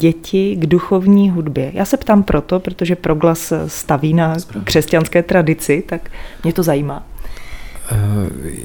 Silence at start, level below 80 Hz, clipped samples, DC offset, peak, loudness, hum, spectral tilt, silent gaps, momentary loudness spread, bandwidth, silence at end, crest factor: 0 s; -32 dBFS; under 0.1%; under 0.1%; 0 dBFS; -15 LUFS; none; -6.5 dB/octave; none; 13 LU; over 20 kHz; 0 s; 16 dB